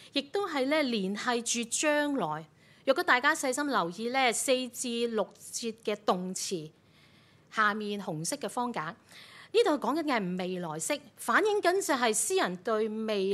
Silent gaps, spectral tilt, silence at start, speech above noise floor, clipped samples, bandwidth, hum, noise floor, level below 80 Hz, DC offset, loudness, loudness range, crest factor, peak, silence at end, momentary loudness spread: none; -3 dB/octave; 0 s; 30 dB; under 0.1%; 15.5 kHz; none; -60 dBFS; -82 dBFS; under 0.1%; -30 LUFS; 5 LU; 20 dB; -10 dBFS; 0 s; 10 LU